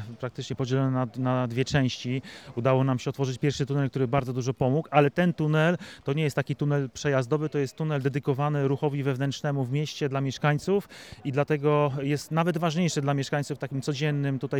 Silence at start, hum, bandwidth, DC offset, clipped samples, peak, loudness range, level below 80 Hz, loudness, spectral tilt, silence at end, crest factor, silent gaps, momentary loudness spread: 0 s; none; 13 kHz; under 0.1%; under 0.1%; -6 dBFS; 2 LU; -58 dBFS; -27 LUFS; -6.5 dB/octave; 0 s; 20 dB; none; 7 LU